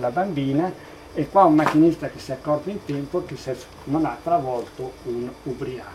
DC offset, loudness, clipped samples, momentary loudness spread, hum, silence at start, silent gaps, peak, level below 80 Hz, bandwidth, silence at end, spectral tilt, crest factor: under 0.1%; -23 LUFS; under 0.1%; 16 LU; none; 0 s; none; -2 dBFS; -52 dBFS; 13.5 kHz; 0 s; -7.5 dB/octave; 20 dB